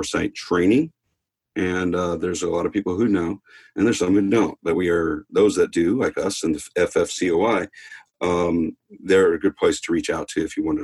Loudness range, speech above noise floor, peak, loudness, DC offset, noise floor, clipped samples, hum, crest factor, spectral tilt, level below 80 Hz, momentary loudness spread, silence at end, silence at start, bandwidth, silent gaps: 2 LU; 56 dB; -6 dBFS; -21 LUFS; under 0.1%; -77 dBFS; under 0.1%; none; 14 dB; -5 dB/octave; -50 dBFS; 8 LU; 0 s; 0 s; 12.5 kHz; none